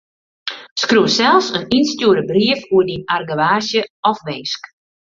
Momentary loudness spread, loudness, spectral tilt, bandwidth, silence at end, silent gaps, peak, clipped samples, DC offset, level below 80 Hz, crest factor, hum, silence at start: 12 LU; -16 LUFS; -4 dB/octave; 7.6 kHz; 0.45 s; 0.71-0.76 s, 3.90-4.03 s; 0 dBFS; under 0.1%; under 0.1%; -54 dBFS; 16 dB; none; 0.45 s